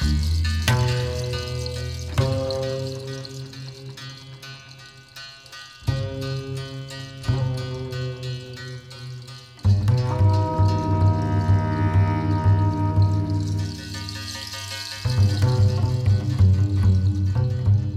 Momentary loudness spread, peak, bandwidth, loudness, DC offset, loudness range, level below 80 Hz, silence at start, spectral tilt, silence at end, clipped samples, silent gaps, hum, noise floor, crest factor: 17 LU; -6 dBFS; 12.5 kHz; -23 LUFS; under 0.1%; 12 LU; -36 dBFS; 0 s; -6.5 dB/octave; 0 s; under 0.1%; none; none; -44 dBFS; 16 dB